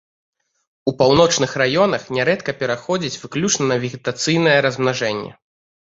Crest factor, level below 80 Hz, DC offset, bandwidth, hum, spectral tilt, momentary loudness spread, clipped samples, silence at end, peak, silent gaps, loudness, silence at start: 18 dB; -54 dBFS; under 0.1%; 8 kHz; none; -4 dB/octave; 10 LU; under 0.1%; 0.65 s; 0 dBFS; none; -18 LUFS; 0.85 s